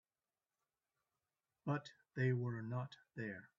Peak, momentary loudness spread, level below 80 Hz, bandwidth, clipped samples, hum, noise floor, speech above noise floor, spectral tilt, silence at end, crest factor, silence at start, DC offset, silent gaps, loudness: -26 dBFS; 12 LU; -82 dBFS; 7.2 kHz; under 0.1%; none; under -90 dBFS; over 48 dB; -7 dB/octave; 0.1 s; 20 dB; 1.65 s; under 0.1%; none; -43 LUFS